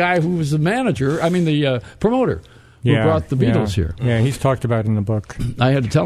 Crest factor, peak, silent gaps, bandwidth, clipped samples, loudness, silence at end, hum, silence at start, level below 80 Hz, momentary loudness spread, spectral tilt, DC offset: 16 dB; 0 dBFS; none; 13.5 kHz; under 0.1%; -18 LUFS; 0 s; none; 0 s; -38 dBFS; 5 LU; -7 dB/octave; under 0.1%